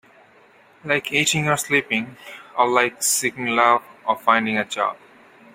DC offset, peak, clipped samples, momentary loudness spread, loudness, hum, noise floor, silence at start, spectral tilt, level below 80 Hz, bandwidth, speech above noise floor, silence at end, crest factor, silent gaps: under 0.1%; -2 dBFS; under 0.1%; 8 LU; -20 LUFS; none; -52 dBFS; 0.85 s; -2.5 dB/octave; -62 dBFS; 16 kHz; 32 dB; 0.6 s; 20 dB; none